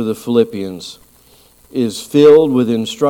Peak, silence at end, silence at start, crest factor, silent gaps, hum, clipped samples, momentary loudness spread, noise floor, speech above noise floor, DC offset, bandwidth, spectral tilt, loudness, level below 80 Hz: 0 dBFS; 0 s; 0 s; 14 dB; none; none; under 0.1%; 18 LU; -48 dBFS; 35 dB; under 0.1%; 16.5 kHz; -6 dB/octave; -13 LUFS; -56 dBFS